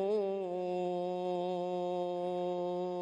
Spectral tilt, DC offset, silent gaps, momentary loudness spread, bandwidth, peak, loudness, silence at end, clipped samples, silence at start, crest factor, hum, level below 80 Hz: -7.5 dB/octave; under 0.1%; none; 2 LU; 8.8 kHz; -24 dBFS; -36 LUFS; 0 s; under 0.1%; 0 s; 10 dB; none; -78 dBFS